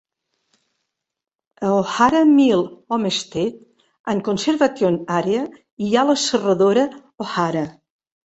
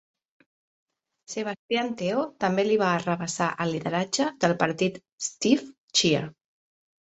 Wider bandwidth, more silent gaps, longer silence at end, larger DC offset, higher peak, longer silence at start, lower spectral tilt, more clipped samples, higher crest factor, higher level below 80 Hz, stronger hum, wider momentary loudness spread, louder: about the same, 8.2 kHz vs 8.4 kHz; second, 4.00-4.04 s, 5.72-5.77 s vs 1.59-1.69 s, 5.12-5.18 s, 5.78-5.88 s; second, 0.55 s vs 0.8 s; neither; first, -2 dBFS vs -6 dBFS; first, 1.6 s vs 1.3 s; about the same, -5 dB/octave vs -4 dB/octave; neither; about the same, 18 dB vs 22 dB; first, -60 dBFS vs -66 dBFS; neither; about the same, 11 LU vs 9 LU; first, -19 LUFS vs -26 LUFS